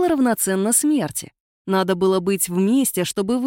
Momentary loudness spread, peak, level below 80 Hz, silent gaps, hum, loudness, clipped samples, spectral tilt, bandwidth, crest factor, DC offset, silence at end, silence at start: 7 LU; -4 dBFS; -58 dBFS; 1.40-1.65 s; none; -19 LUFS; under 0.1%; -4.5 dB/octave; 17 kHz; 14 dB; under 0.1%; 0 s; 0 s